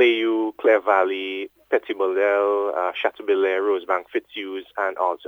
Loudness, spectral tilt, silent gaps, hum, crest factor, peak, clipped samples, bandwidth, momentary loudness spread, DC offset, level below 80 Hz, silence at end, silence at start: -22 LUFS; -4 dB/octave; none; none; 18 dB; -4 dBFS; under 0.1%; 6.2 kHz; 11 LU; under 0.1%; -74 dBFS; 0.1 s; 0 s